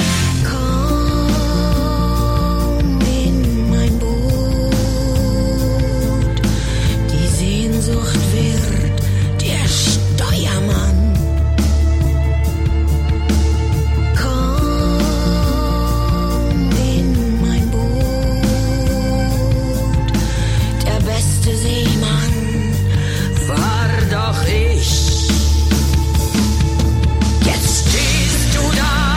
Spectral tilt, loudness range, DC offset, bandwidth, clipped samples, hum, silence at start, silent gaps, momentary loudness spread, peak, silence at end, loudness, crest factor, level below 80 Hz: -5 dB/octave; 2 LU; under 0.1%; 16.5 kHz; under 0.1%; none; 0 s; none; 3 LU; -2 dBFS; 0 s; -16 LUFS; 12 dB; -18 dBFS